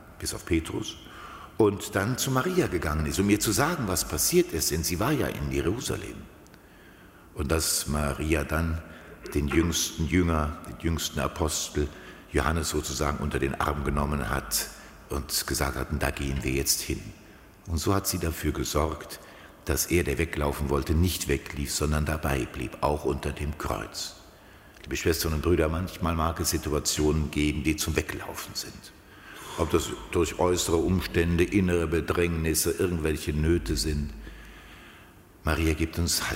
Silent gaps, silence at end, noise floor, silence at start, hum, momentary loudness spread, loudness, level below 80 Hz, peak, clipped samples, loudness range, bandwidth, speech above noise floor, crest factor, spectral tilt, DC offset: none; 0 s; -52 dBFS; 0 s; none; 12 LU; -27 LUFS; -38 dBFS; -8 dBFS; under 0.1%; 4 LU; 16 kHz; 25 dB; 20 dB; -4.5 dB/octave; under 0.1%